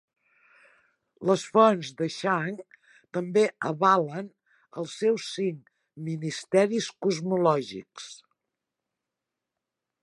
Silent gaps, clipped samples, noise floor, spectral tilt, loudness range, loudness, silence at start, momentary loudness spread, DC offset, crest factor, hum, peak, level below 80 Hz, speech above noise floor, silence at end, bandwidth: none; under 0.1%; -87 dBFS; -5.5 dB/octave; 4 LU; -26 LUFS; 1.2 s; 18 LU; under 0.1%; 22 dB; none; -6 dBFS; -78 dBFS; 61 dB; 1.85 s; 11.5 kHz